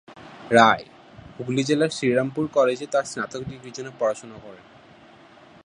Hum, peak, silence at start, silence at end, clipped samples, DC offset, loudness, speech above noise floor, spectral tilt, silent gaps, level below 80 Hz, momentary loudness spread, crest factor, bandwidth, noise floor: none; -2 dBFS; 0.1 s; 1.1 s; under 0.1%; under 0.1%; -22 LUFS; 27 dB; -5 dB/octave; none; -60 dBFS; 19 LU; 22 dB; 11.5 kHz; -50 dBFS